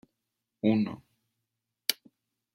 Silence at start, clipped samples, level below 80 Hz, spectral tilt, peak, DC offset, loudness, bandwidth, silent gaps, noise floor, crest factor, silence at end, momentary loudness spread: 0.65 s; under 0.1%; -74 dBFS; -4.5 dB/octave; -4 dBFS; under 0.1%; -30 LUFS; 16.5 kHz; none; -85 dBFS; 30 dB; 0.6 s; 15 LU